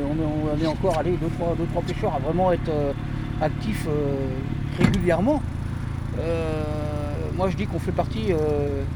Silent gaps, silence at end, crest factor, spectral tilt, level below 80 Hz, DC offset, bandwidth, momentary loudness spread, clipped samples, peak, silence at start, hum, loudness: none; 0 s; 20 dB; -7.5 dB/octave; -34 dBFS; under 0.1%; 19.5 kHz; 7 LU; under 0.1%; -4 dBFS; 0 s; none; -25 LUFS